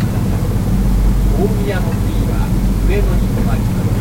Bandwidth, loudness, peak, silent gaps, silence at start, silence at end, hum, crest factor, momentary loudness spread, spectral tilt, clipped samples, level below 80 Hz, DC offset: 16.5 kHz; -16 LUFS; -2 dBFS; none; 0 s; 0 s; none; 12 dB; 2 LU; -7.5 dB/octave; under 0.1%; -16 dBFS; under 0.1%